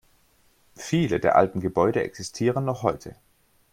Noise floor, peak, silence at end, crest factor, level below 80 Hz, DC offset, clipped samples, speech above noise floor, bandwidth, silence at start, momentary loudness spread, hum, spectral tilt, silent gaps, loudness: -62 dBFS; -4 dBFS; 0.6 s; 22 dB; -56 dBFS; under 0.1%; under 0.1%; 38 dB; 16 kHz; 0.8 s; 14 LU; none; -6 dB/octave; none; -24 LUFS